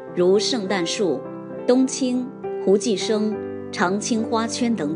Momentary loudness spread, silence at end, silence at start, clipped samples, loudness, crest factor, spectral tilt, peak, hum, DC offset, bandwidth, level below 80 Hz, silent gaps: 9 LU; 0 s; 0 s; under 0.1%; -22 LUFS; 18 dB; -4.5 dB/octave; -4 dBFS; none; under 0.1%; 10 kHz; -70 dBFS; none